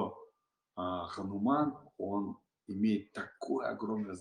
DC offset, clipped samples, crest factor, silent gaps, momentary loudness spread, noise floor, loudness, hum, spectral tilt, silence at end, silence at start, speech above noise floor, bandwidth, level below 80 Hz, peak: under 0.1%; under 0.1%; 18 dB; none; 13 LU; -75 dBFS; -36 LUFS; none; -7.5 dB/octave; 0 s; 0 s; 40 dB; 10 kHz; -78 dBFS; -18 dBFS